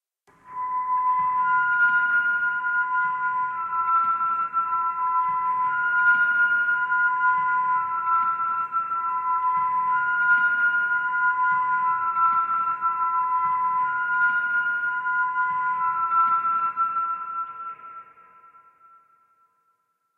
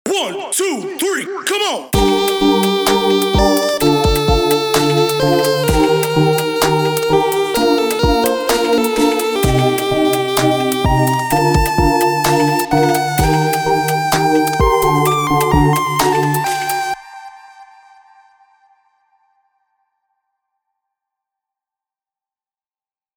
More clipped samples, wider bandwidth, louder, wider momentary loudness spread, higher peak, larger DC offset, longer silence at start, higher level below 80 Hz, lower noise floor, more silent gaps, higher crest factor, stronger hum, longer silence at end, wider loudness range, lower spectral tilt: neither; second, 3.9 kHz vs over 20 kHz; second, -22 LUFS vs -14 LUFS; about the same, 6 LU vs 4 LU; second, -10 dBFS vs 0 dBFS; neither; first, 0.45 s vs 0.05 s; second, -74 dBFS vs -28 dBFS; second, -71 dBFS vs under -90 dBFS; neither; about the same, 14 dB vs 16 dB; neither; second, 2.15 s vs 5.55 s; about the same, 4 LU vs 3 LU; about the same, -4.5 dB/octave vs -4.5 dB/octave